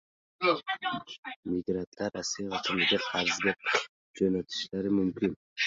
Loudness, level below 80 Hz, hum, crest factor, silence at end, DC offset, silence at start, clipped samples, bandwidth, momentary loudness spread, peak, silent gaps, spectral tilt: -30 LUFS; -62 dBFS; none; 20 dB; 0 s; under 0.1%; 0.4 s; under 0.1%; 7.8 kHz; 8 LU; -12 dBFS; 1.18-1.23 s, 1.36-1.43 s, 1.87-1.92 s, 3.89-4.14 s, 5.36-5.56 s; -3.5 dB/octave